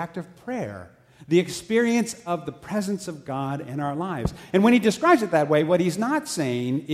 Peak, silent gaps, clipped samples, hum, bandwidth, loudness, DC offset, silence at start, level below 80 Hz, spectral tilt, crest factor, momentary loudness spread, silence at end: -6 dBFS; none; under 0.1%; none; 15.5 kHz; -24 LUFS; under 0.1%; 0 s; -50 dBFS; -5.5 dB/octave; 18 dB; 13 LU; 0 s